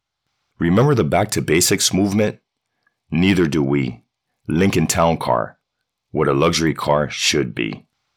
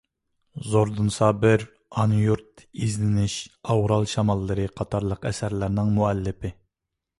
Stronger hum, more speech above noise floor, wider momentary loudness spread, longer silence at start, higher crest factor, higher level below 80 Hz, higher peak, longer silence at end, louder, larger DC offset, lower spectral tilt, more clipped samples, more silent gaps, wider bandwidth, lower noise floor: neither; about the same, 60 dB vs 61 dB; about the same, 10 LU vs 11 LU; about the same, 0.6 s vs 0.55 s; about the same, 14 dB vs 18 dB; about the same, -44 dBFS vs -44 dBFS; about the same, -4 dBFS vs -6 dBFS; second, 0.4 s vs 0.65 s; first, -18 LUFS vs -24 LUFS; neither; second, -4.5 dB/octave vs -6.5 dB/octave; neither; neither; first, 20 kHz vs 11.5 kHz; second, -77 dBFS vs -84 dBFS